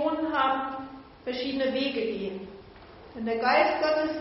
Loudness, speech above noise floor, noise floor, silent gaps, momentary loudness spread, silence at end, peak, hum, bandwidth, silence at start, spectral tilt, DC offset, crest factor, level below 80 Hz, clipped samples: -27 LUFS; 22 dB; -48 dBFS; none; 19 LU; 0 s; -10 dBFS; none; 6 kHz; 0 s; -2 dB/octave; under 0.1%; 18 dB; -60 dBFS; under 0.1%